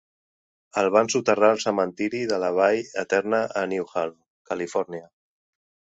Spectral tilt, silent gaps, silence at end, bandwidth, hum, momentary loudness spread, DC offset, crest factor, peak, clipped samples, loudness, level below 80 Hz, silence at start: -4 dB/octave; 4.30-4.45 s; 0.9 s; 8 kHz; none; 11 LU; under 0.1%; 20 dB; -6 dBFS; under 0.1%; -24 LUFS; -68 dBFS; 0.75 s